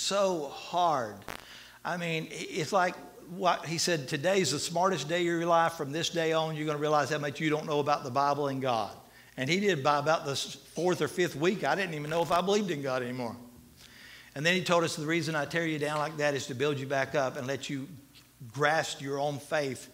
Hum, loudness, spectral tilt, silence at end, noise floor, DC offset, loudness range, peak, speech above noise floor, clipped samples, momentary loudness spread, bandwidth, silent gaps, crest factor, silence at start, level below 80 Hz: none; -30 LUFS; -4 dB/octave; 0 s; -54 dBFS; under 0.1%; 3 LU; -10 dBFS; 24 dB; under 0.1%; 11 LU; 16 kHz; none; 20 dB; 0 s; -68 dBFS